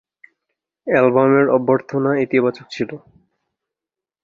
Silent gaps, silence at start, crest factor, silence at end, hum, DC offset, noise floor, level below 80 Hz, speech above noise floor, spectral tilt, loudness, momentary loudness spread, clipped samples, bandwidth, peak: none; 0.85 s; 18 dB; 1.25 s; none; under 0.1%; -88 dBFS; -64 dBFS; 71 dB; -8 dB/octave; -17 LUFS; 13 LU; under 0.1%; 7.2 kHz; -2 dBFS